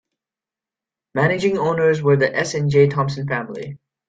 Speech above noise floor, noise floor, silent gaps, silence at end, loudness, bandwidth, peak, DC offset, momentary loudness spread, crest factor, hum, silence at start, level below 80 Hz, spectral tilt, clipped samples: 71 dB; -89 dBFS; none; 0.35 s; -19 LUFS; 9 kHz; -4 dBFS; under 0.1%; 13 LU; 16 dB; none; 1.15 s; -56 dBFS; -6.5 dB/octave; under 0.1%